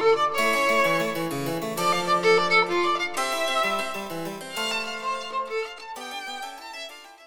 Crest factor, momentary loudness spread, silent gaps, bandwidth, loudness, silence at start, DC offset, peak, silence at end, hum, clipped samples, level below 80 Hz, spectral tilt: 18 dB; 15 LU; none; over 20 kHz; -24 LUFS; 0 s; under 0.1%; -8 dBFS; 0 s; none; under 0.1%; -64 dBFS; -3 dB/octave